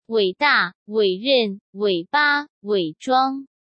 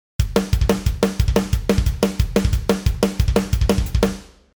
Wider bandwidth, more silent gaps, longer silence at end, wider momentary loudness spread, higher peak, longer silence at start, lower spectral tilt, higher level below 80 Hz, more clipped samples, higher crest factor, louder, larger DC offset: second, 8.6 kHz vs over 20 kHz; first, 0.75-0.86 s, 1.61-1.73 s, 2.50-2.61 s vs none; about the same, 0.35 s vs 0.3 s; first, 7 LU vs 2 LU; second, -6 dBFS vs -2 dBFS; about the same, 0.1 s vs 0.2 s; about the same, -5 dB/octave vs -6 dB/octave; second, -76 dBFS vs -22 dBFS; neither; about the same, 16 dB vs 18 dB; about the same, -20 LUFS vs -20 LUFS; second, under 0.1% vs 0.1%